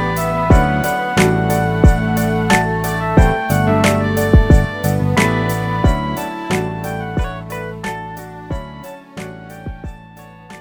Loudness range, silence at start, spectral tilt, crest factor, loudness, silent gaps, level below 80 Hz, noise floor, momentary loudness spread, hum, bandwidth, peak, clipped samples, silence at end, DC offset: 12 LU; 0 s; -6 dB/octave; 16 dB; -16 LUFS; none; -22 dBFS; -39 dBFS; 18 LU; none; over 20 kHz; 0 dBFS; under 0.1%; 0 s; under 0.1%